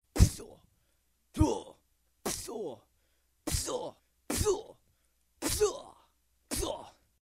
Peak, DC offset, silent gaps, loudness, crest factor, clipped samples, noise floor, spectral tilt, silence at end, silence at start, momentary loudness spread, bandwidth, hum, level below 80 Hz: -8 dBFS; under 0.1%; none; -33 LUFS; 26 dB; under 0.1%; -74 dBFS; -4.5 dB/octave; 0.3 s; 0.15 s; 18 LU; 16 kHz; none; -42 dBFS